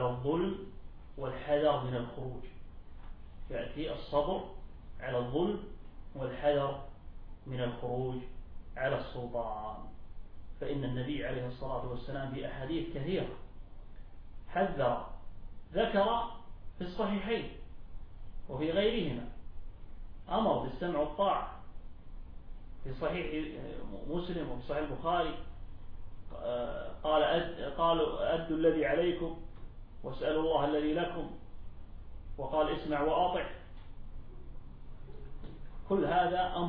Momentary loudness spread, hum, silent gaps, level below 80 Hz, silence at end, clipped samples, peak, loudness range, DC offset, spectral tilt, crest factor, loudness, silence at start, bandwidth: 24 LU; none; none; -46 dBFS; 0 s; under 0.1%; -16 dBFS; 7 LU; under 0.1%; -4.5 dB/octave; 18 dB; -34 LUFS; 0 s; 5.2 kHz